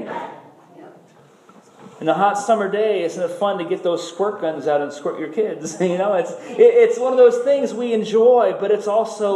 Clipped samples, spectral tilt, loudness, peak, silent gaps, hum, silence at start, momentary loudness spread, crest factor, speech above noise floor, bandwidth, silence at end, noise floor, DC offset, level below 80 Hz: under 0.1%; -5 dB/octave; -18 LUFS; -2 dBFS; none; none; 0 s; 11 LU; 16 dB; 32 dB; 11.5 kHz; 0 s; -50 dBFS; under 0.1%; -80 dBFS